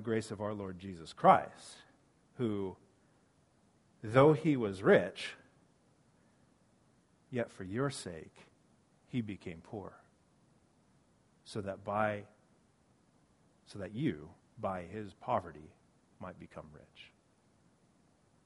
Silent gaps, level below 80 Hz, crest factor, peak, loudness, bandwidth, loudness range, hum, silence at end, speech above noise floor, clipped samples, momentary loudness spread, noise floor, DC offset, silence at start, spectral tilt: none; -70 dBFS; 26 dB; -10 dBFS; -34 LUFS; 11.5 kHz; 13 LU; none; 1.4 s; 36 dB; under 0.1%; 26 LU; -70 dBFS; under 0.1%; 0 s; -6.5 dB/octave